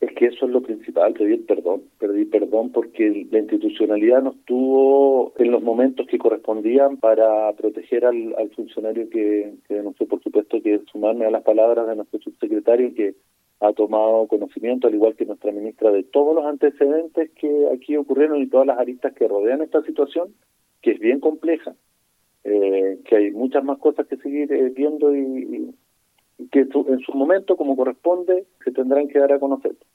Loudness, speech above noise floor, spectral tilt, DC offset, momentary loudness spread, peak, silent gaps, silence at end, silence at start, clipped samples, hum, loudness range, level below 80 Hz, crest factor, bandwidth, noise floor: -20 LUFS; 47 dB; -7 dB/octave; under 0.1%; 9 LU; -2 dBFS; none; 0.2 s; 0 s; under 0.1%; none; 4 LU; -78 dBFS; 16 dB; 4 kHz; -66 dBFS